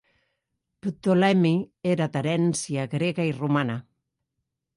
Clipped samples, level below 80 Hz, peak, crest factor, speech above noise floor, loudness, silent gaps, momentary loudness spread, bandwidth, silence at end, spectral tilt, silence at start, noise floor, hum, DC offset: under 0.1%; -66 dBFS; -8 dBFS; 16 dB; 58 dB; -25 LUFS; none; 10 LU; 11.5 kHz; 0.95 s; -6 dB/octave; 0.85 s; -81 dBFS; none; under 0.1%